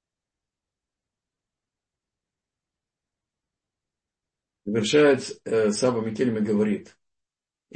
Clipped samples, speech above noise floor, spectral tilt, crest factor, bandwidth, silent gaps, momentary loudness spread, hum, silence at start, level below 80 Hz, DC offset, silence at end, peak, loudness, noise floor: under 0.1%; 66 dB; -5 dB/octave; 20 dB; 8.8 kHz; none; 10 LU; none; 4.65 s; -70 dBFS; under 0.1%; 0.95 s; -8 dBFS; -23 LUFS; -88 dBFS